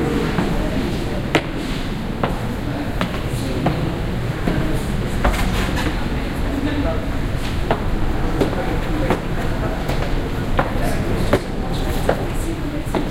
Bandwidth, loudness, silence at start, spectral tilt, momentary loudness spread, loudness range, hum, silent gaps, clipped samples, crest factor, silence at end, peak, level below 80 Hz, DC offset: 16 kHz; -22 LUFS; 0 s; -6 dB/octave; 4 LU; 1 LU; none; none; under 0.1%; 20 dB; 0 s; 0 dBFS; -24 dBFS; under 0.1%